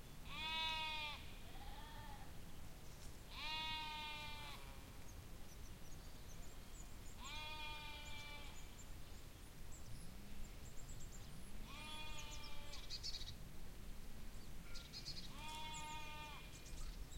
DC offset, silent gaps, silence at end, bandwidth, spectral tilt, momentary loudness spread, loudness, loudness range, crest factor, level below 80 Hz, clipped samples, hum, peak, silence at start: under 0.1%; none; 0 s; 16.5 kHz; -2.5 dB/octave; 13 LU; -51 LUFS; 7 LU; 20 dB; -56 dBFS; under 0.1%; none; -30 dBFS; 0 s